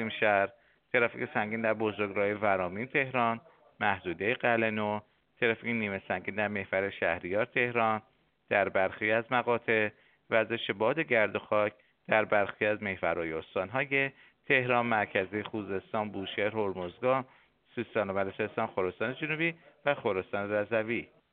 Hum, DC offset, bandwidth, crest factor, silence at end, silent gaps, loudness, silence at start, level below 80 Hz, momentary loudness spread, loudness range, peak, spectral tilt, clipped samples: none; under 0.1%; 4.5 kHz; 22 dB; 0.25 s; none; -30 LUFS; 0 s; -70 dBFS; 7 LU; 4 LU; -10 dBFS; -3.5 dB/octave; under 0.1%